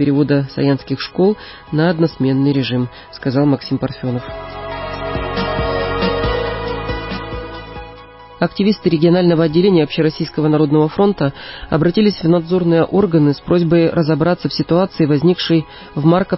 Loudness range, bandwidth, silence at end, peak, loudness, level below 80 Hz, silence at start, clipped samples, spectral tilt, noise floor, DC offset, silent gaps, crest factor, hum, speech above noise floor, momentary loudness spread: 6 LU; 5.8 kHz; 0 s; -2 dBFS; -16 LUFS; -36 dBFS; 0 s; under 0.1%; -11 dB/octave; -38 dBFS; under 0.1%; none; 14 dB; none; 23 dB; 12 LU